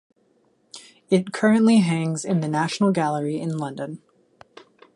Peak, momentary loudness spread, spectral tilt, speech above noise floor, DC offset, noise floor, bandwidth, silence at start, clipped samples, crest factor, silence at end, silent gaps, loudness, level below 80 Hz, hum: -6 dBFS; 22 LU; -6 dB/octave; 43 dB; under 0.1%; -63 dBFS; 11.5 kHz; 0.75 s; under 0.1%; 16 dB; 1 s; none; -21 LUFS; -68 dBFS; none